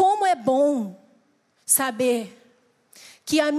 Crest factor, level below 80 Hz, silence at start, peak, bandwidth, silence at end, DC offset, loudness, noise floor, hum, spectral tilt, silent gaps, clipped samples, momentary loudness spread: 18 dB; -74 dBFS; 0 s; -6 dBFS; 15 kHz; 0 s; under 0.1%; -22 LUFS; -64 dBFS; none; -2.5 dB/octave; none; under 0.1%; 19 LU